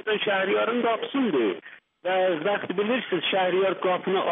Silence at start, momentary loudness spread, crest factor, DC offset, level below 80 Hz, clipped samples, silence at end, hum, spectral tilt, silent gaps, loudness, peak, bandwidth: 0.05 s; 4 LU; 12 dB; under 0.1%; -80 dBFS; under 0.1%; 0 s; none; -2.5 dB/octave; none; -25 LUFS; -14 dBFS; 3.9 kHz